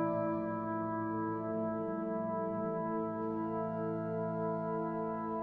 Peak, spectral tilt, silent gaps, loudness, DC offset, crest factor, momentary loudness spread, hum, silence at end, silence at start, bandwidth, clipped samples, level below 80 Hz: -24 dBFS; -11 dB/octave; none; -37 LUFS; under 0.1%; 12 dB; 1 LU; none; 0 s; 0 s; 4.2 kHz; under 0.1%; -68 dBFS